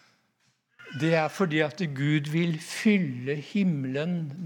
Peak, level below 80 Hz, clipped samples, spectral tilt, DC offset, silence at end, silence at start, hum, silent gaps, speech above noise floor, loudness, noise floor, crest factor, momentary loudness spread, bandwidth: -8 dBFS; -82 dBFS; under 0.1%; -6.5 dB/octave; under 0.1%; 0 s; 0.8 s; none; none; 44 dB; -27 LUFS; -71 dBFS; 18 dB; 6 LU; 18 kHz